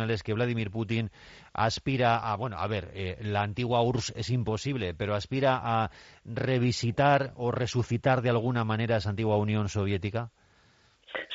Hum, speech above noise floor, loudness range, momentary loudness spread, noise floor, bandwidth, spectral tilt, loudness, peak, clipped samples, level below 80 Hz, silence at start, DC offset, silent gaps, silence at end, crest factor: none; 35 dB; 3 LU; 9 LU; -63 dBFS; 7.8 kHz; -5.5 dB/octave; -29 LUFS; -12 dBFS; under 0.1%; -56 dBFS; 0 s; under 0.1%; none; 0 s; 18 dB